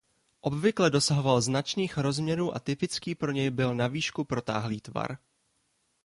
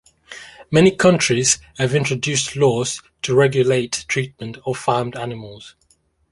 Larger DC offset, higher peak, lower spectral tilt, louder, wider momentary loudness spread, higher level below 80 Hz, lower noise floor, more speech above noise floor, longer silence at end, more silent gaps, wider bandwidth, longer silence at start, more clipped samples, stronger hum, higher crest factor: neither; second, -10 dBFS vs -2 dBFS; about the same, -5 dB/octave vs -4 dB/octave; second, -29 LUFS vs -18 LUFS; second, 10 LU vs 17 LU; second, -60 dBFS vs -52 dBFS; first, -74 dBFS vs -61 dBFS; about the same, 45 dB vs 43 dB; first, 0.9 s vs 0.65 s; neither; about the same, 11.5 kHz vs 11.5 kHz; first, 0.45 s vs 0.3 s; neither; neither; about the same, 20 dB vs 18 dB